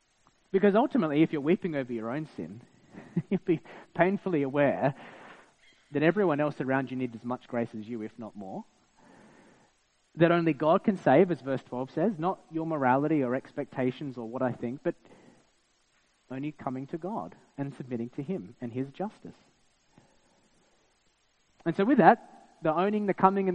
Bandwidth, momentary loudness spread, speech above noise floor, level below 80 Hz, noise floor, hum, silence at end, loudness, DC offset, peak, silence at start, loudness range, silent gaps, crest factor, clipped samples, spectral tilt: 9 kHz; 15 LU; 41 dB; -72 dBFS; -70 dBFS; none; 0 s; -29 LUFS; under 0.1%; -4 dBFS; 0.55 s; 12 LU; none; 26 dB; under 0.1%; -8.5 dB/octave